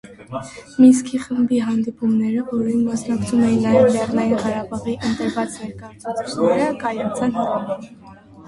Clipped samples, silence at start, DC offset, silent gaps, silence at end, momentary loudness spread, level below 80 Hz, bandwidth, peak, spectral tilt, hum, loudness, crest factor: under 0.1%; 0.05 s; under 0.1%; none; 0 s; 16 LU; -52 dBFS; 11.5 kHz; -2 dBFS; -6 dB/octave; none; -19 LUFS; 18 dB